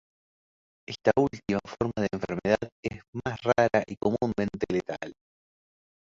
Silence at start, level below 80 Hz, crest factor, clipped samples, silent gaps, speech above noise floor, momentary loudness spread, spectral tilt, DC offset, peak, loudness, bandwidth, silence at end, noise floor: 0.9 s; -56 dBFS; 24 dB; under 0.1%; 2.72-2.83 s, 3.08-3.13 s; over 63 dB; 12 LU; -6.5 dB/octave; under 0.1%; -6 dBFS; -28 LUFS; 7.6 kHz; 1 s; under -90 dBFS